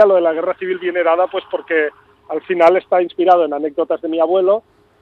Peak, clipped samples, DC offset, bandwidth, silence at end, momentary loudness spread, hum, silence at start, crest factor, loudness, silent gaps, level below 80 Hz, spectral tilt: 0 dBFS; under 0.1%; under 0.1%; 6 kHz; 0.4 s; 8 LU; none; 0 s; 16 dB; -16 LUFS; none; -64 dBFS; -6.5 dB/octave